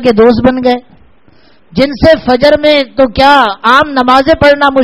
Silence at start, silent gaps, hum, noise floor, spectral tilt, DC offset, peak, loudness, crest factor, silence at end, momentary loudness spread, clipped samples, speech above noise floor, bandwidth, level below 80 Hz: 0 s; none; none; -46 dBFS; -6 dB/octave; 0.8%; 0 dBFS; -7 LUFS; 8 dB; 0 s; 7 LU; 2%; 39 dB; 13 kHz; -32 dBFS